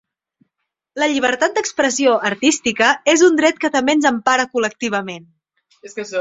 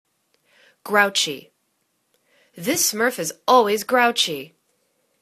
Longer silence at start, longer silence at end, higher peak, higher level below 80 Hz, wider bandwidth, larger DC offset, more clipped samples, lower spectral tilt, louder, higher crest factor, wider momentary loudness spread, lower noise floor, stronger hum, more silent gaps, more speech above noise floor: about the same, 0.95 s vs 0.85 s; second, 0 s vs 0.75 s; about the same, 0 dBFS vs 0 dBFS; first, -60 dBFS vs -72 dBFS; second, 8 kHz vs 14 kHz; neither; neither; about the same, -2.5 dB/octave vs -1.5 dB/octave; first, -16 LUFS vs -19 LUFS; about the same, 18 dB vs 22 dB; about the same, 13 LU vs 13 LU; first, -77 dBFS vs -70 dBFS; neither; neither; first, 60 dB vs 50 dB